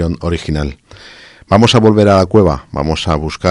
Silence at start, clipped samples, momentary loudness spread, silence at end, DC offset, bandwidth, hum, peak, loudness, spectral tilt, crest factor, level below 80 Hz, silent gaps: 0 s; 0.3%; 10 LU; 0 s; under 0.1%; 11.5 kHz; none; 0 dBFS; -12 LUFS; -6 dB/octave; 12 dB; -26 dBFS; none